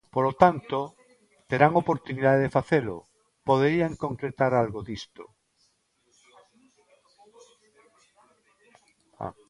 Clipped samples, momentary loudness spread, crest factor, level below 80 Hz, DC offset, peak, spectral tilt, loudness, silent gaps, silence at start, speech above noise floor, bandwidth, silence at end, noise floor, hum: under 0.1%; 17 LU; 26 dB; -58 dBFS; under 0.1%; -2 dBFS; -7.5 dB/octave; -25 LUFS; none; 0.15 s; 45 dB; 11 kHz; 0.2 s; -69 dBFS; none